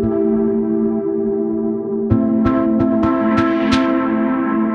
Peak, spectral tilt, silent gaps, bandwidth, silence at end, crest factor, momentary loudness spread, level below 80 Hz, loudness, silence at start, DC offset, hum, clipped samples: -2 dBFS; -8 dB/octave; none; 7.4 kHz; 0 s; 14 dB; 4 LU; -40 dBFS; -17 LUFS; 0 s; under 0.1%; none; under 0.1%